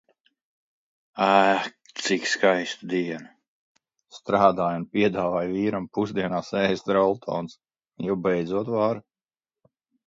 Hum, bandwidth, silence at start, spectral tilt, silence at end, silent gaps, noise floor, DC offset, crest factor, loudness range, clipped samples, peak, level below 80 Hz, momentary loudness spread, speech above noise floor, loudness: none; 8 kHz; 1.15 s; -5 dB/octave; 1.05 s; 3.48-3.75 s; under -90 dBFS; under 0.1%; 22 dB; 2 LU; under 0.1%; -2 dBFS; -62 dBFS; 12 LU; over 66 dB; -24 LUFS